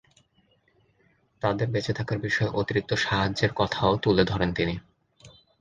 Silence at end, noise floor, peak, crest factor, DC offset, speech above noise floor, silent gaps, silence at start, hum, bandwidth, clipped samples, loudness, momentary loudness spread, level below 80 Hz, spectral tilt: 0.3 s; -66 dBFS; -6 dBFS; 20 dB; under 0.1%; 41 dB; none; 1.45 s; none; 9.4 kHz; under 0.1%; -26 LUFS; 6 LU; -48 dBFS; -6 dB/octave